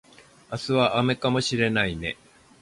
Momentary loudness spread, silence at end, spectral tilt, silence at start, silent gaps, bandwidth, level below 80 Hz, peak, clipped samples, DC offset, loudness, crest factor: 12 LU; 0.5 s; -5 dB/octave; 0.5 s; none; 11.5 kHz; -50 dBFS; -8 dBFS; under 0.1%; under 0.1%; -24 LUFS; 18 dB